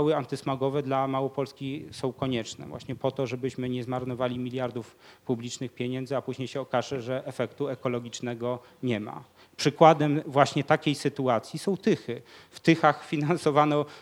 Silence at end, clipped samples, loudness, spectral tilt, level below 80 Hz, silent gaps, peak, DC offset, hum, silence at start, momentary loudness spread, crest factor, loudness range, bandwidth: 0 s; under 0.1%; -28 LUFS; -6 dB/octave; -68 dBFS; none; -4 dBFS; under 0.1%; none; 0 s; 12 LU; 24 dB; 8 LU; 16 kHz